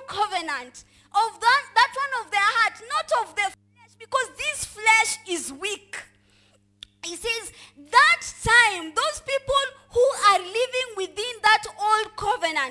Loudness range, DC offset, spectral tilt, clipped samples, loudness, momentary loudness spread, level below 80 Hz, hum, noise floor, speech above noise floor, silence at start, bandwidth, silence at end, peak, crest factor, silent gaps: 5 LU; under 0.1%; -1 dB/octave; under 0.1%; -22 LUFS; 12 LU; -54 dBFS; none; -61 dBFS; 37 dB; 0 s; 12 kHz; 0 s; -2 dBFS; 22 dB; none